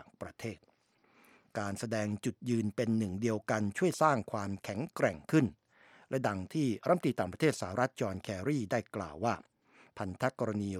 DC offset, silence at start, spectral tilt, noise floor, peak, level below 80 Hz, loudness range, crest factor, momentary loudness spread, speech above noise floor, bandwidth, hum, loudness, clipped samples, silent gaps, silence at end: under 0.1%; 0 s; -6 dB/octave; -69 dBFS; -12 dBFS; -68 dBFS; 3 LU; 22 dB; 12 LU; 36 dB; 15.5 kHz; none; -34 LUFS; under 0.1%; none; 0 s